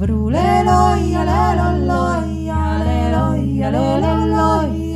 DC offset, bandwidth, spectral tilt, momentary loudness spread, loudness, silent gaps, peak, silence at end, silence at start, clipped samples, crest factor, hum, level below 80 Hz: under 0.1%; 12 kHz; -7.5 dB/octave; 5 LU; -16 LUFS; none; -2 dBFS; 0 s; 0 s; under 0.1%; 14 dB; none; -24 dBFS